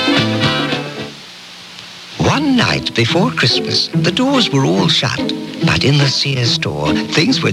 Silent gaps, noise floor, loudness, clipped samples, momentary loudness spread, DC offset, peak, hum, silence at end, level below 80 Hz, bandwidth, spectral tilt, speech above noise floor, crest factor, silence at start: none; -34 dBFS; -14 LUFS; under 0.1%; 17 LU; under 0.1%; 0 dBFS; none; 0 s; -44 dBFS; 14 kHz; -4.5 dB/octave; 20 dB; 14 dB; 0 s